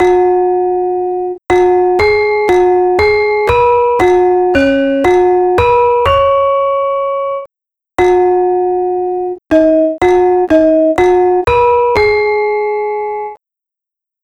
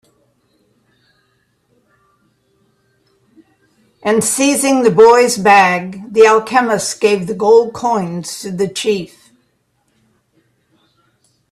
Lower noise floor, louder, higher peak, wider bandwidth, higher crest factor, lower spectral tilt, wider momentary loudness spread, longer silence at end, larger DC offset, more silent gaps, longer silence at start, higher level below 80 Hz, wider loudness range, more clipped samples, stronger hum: first, -84 dBFS vs -62 dBFS; about the same, -11 LUFS vs -13 LUFS; about the same, 0 dBFS vs 0 dBFS; second, 9 kHz vs 14 kHz; second, 10 dB vs 16 dB; first, -6.5 dB/octave vs -3.5 dB/octave; second, 7 LU vs 13 LU; second, 0.9 s vs 2.45 s; neither; neither; second, 0 s vs 4.05 s; first, -36 dBFS vs -58 dBFS; second, 3 LU vs 13 LU; neither; neither